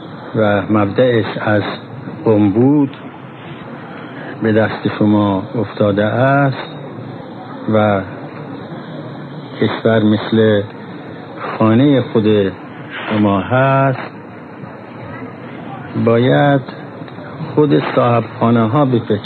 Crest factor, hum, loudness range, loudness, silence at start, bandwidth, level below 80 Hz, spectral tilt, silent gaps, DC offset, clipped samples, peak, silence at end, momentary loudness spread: 16 dB; none; 4 LU; -14 LUFS; 0 s; 4.5 kHz; -56 dBFS; -10 dB/octave; none; under 0.1%; under 0.1%; 0 dBFS; 0 s; 18 LU